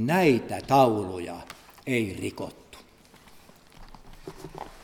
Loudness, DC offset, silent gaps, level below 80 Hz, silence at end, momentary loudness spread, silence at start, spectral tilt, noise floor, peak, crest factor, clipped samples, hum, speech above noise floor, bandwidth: -25 LUFS; under 0.1%; none; -54 dBFS; 0 s; 23 LU; 0 s; -6 dB/octave; -54 dBFS; -6 dBFS; 22 dB; under 0.1%; none; 29 dB; 18.5 kHz